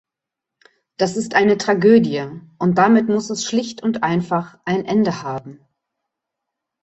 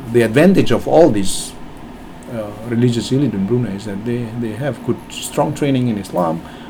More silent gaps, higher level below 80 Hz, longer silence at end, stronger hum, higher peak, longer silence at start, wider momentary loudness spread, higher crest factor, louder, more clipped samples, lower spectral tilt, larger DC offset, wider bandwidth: neither; second, -60 dBFS vs -38 dBFS; first, 1.25 s vs 0 s; neither; about the same, -2 dBFS vs 0 dBFS; first, 1 s vs 0 s; second, 11 LU vs 17 LU; about the same, 18 dB vs 16 dB; about the same, -18 LUFS vs -17 LUFS; neither; about the same, -5.5 dB/octave vs -6 dB/octave; neither; second, 8.2 kHz vs over 20 kHz